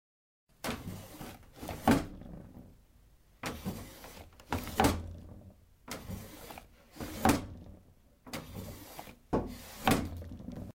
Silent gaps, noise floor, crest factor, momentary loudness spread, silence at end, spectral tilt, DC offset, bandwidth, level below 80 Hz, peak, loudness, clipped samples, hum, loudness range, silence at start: none; -62 dBFS; 26 dB; 21 LU; 0.05 s; -5 dB/octave; under 0.1%; 16.5 kHz; -50 dBFS; -12 dBFS; -35 LUFS; under 0.1%; none; 3 LU; 0.65 s